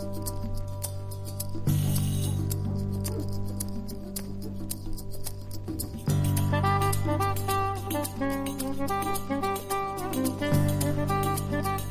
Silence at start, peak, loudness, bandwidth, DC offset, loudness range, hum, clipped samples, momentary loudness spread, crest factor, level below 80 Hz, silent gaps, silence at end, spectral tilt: 0 s; -12 dBFS; -30 LUFS; 16 kHz; under 0.1%; 5 LU; none; under 0.1%; 11 LU; 16 dB; -40 dBFS; none; 0 s; -5.5 dB/octave